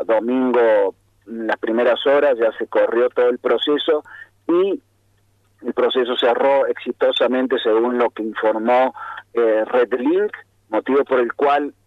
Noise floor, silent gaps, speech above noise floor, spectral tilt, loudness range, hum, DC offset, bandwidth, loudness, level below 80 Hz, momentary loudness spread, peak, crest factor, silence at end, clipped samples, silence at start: -60 dBFS; none; 42 dB; -5.5 dB/octave; 2 LU; none; under 0.1%; 5.2 kHz; -18 LUFS; -68 dBFS; 9 LU; -6 dBFS; 12 dB; 0.15 s; under 0.1%; 0 s